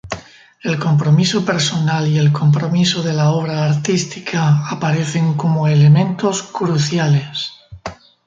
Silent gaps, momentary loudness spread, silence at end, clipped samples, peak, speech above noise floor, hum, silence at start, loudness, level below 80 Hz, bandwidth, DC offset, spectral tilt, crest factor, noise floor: none; 12 LU; 0.3 s; under 0.1%; -2 dBFS; 23 dB; none; 0.05 s; -16 LUFS; -52 dBFS; 7.8 kHz; under 0.1%; -6 dB/octave; 14 dB; -38 dBFS